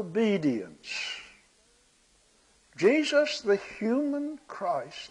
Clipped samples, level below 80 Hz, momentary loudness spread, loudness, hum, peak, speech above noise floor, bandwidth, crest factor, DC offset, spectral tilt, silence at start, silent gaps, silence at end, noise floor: under 0.1%; -70 dBFS; 12 LU; -28 LUFS; none; -10 dBFS; 37 dB; 10.5 kHz; 20 dB; under 0.1%; -5 dB/octave; 0 s; none; 0 s; -64 dBFS